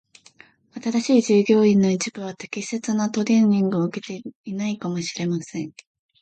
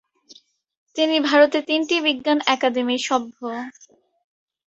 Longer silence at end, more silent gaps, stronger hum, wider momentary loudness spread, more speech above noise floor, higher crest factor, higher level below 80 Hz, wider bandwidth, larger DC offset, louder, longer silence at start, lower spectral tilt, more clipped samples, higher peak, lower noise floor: second, 0.5 s vs 0.95 s; about the same, 4.35-4.44 s vs 0.77-0.86 s; neither; about the same, 16 LU vs 14 LU; about the same, 31 dB vs 32 dB; about the same, 16 dB vs 20 dB; about the same, -68 dBFS vs -70 dBFS; about the same, 9 kHz vs 8.2 kHz; neither; about the same, -21 LUFS vs -20 LUFS; first, 0.75 s vs 0.3 s; first, -6 dB/octave vs -2 dB/octave; neither; second, -6 dBFS vs -2 dBFS; about the same, -53 dBFS vs -52 dBFS